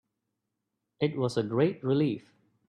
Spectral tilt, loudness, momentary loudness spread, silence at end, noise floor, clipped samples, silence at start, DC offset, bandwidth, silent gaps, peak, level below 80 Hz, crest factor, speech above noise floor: -7.5 dB/octave; -29 LUFS; 5 LU; 0.5 s; -84 dBFS; under 0.1%; 1 s; under 0.1%; 11.5 kHz; none; -12 dBFS; -70 dBFS; 18 dB; 56 dB